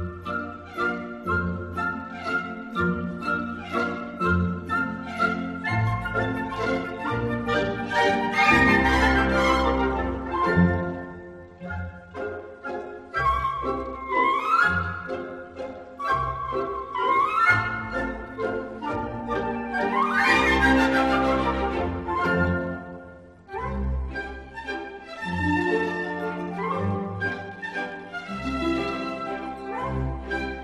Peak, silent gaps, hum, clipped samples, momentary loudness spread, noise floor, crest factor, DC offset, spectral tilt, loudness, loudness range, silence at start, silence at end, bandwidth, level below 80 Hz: -4 dBFS; none; none; under 0.1%; 15 LU; -45 dBFS; 20 dB; under 0.1%; -6 dB/octave; -25 LUFS; 8 LU; 0 s; 0 s; 13.5 kHz; -40 dBFS